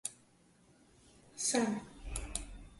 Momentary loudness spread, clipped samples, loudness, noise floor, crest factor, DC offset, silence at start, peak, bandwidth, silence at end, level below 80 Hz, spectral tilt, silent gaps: 13 LU; under 0.1%; -37 LUFS; -67 dBFS; 24 dB; under 0.1%; 0.05 s; -16 dBFS; 12 kHz; 0 s; -52 dBFS; -3 dB/octave; none